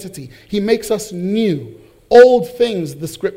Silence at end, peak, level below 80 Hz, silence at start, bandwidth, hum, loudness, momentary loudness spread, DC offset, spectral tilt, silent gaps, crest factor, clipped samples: 0 s; 0 dBFS; -50 dBFS; 0 s; 16 kHz; none; -14 LUFS; 17 LU; under 0.1%; -5.5 dB/octave; none; 14 dB; 1%